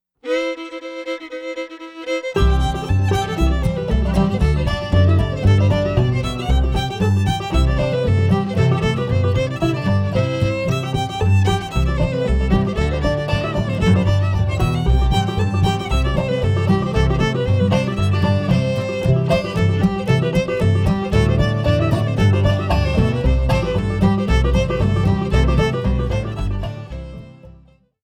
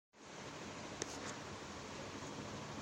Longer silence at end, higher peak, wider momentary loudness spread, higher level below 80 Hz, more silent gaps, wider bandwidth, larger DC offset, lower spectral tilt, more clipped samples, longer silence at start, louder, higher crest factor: first, 0.55 s vs 0 s; first, -4 dBFS vs -20 dBFS; about the same, 6 LU vs 5 LU; first, -24 dBFS vs -68 dBFS; neither; second, 11 kHz vs 16 kHz; neither; first, -7 dB/octave vs -3.5 dB/octave; neither; about the same, 0.25 s vs 0.15 s; first, -18 LUFS vs -48 LUFS; second, 12 dB vs 30 dB